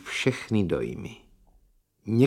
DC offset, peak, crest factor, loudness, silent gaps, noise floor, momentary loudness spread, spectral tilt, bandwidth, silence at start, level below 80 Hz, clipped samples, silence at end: under 0.1%; -8 dBFS; 20 dB; -28 LUFS; none; -63 dBFS; 16 LU; -6.5 dB/octave; 14.5 kHz; 0 s; -54 dBFS; under 0.1%; 0 s